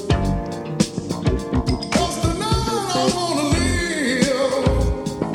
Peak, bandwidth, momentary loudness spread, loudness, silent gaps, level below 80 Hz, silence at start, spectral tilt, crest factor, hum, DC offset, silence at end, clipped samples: -2 dBFS; 17 kHz; 5 LU; -21 LUFS; none; -28 dBFS; 0 s; -5 dB/octave; 18 dB; none; under 0.1%; 0 s; under 0.1%